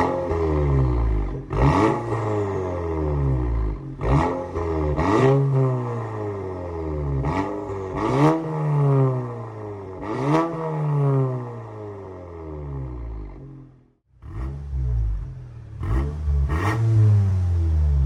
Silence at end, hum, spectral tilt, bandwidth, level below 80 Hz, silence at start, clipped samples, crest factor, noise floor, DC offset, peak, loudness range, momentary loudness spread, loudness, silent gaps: 0 s; none; -9 dB/octave; 9.8 kHz; -30 dBFS; 0 s; under 0.1%; 16 dB; -55 dBFS; under 0.1%; -6 dBFS; 9 LU; 16 LU; -23 LUFS; none